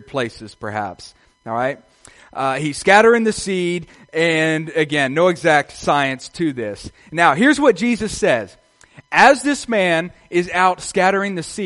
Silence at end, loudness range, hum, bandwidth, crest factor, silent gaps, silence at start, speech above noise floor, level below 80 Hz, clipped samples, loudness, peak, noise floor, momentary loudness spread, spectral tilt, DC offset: 0 s; 2 LU; none; 11.5 kHz; 18 dB; none; 0.15 s; 30 dB; -50 dBFS; under 0.1%; -17 LUFS; 0 dBFS; -48 dBFS; 15 LU; -4.5 dB/octave; under 0.1%